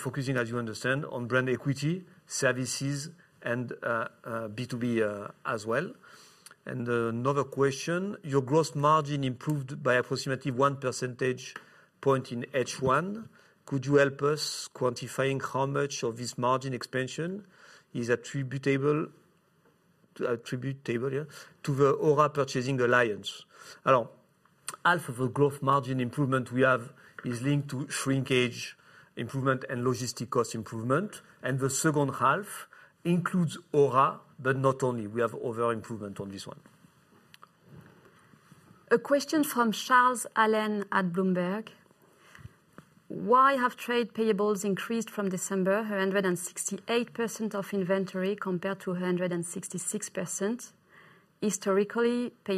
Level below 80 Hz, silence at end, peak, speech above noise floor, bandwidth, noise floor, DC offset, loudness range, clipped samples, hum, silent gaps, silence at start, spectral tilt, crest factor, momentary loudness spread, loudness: -72 dBFS; 0 s; -10 dBFS; 37 dB; 14 kHz; -66 dBFS; under 0.1%; 5 LU; under 0.1%; none; none; 0 s; -5 dB/octave; 20 dB; 12 LU; -29 LUFS